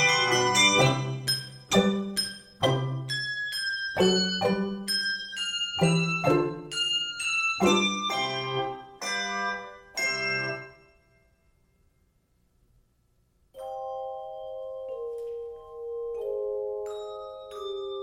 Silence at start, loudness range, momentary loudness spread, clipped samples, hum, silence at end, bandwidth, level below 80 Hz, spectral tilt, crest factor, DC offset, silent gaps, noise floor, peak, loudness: 0 s; 15 LU; 16 LU; under 0.1%; none; 0 s; 16.5 kHz; -60 dBFS; -3.5 dB/octave; 20 dB; under 0.1%; none; -68 dBFS; -8 dBFS; -27 LUFS